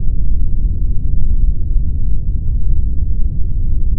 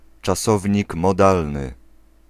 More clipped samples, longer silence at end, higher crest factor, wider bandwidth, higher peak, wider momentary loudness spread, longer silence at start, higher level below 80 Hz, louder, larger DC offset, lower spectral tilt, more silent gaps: neither; second, 0 s vs 0.55 s; second, 10 dB vs 20 dB; second, 0.6 kHz vs 15.5 kHz; about the same, 0 dBFS vs -2 dBFS; second, 2 LU vs 12 LU; second, 0 s vs 0.25 s; first, -14 dBFS vs -38 dBFS; about the same, -20 LUFS vs -19 LUFS; neither; first, -17.5 dB/octave vs -6 dB/octave; neither